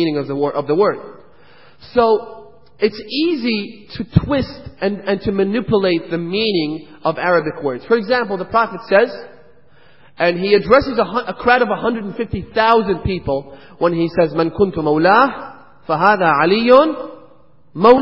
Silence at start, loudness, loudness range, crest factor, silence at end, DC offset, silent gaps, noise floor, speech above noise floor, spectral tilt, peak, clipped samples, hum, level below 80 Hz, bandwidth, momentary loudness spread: 0 s; -16 LUFS; 5 LU; 16 dB; 0 s; 0.6%; none; -51 dBFS; 35 dB; -8.5 dB/octave; 0 dBFS; under 0.1%; none; -42 dBFS; 5.8 kHz; 12 LU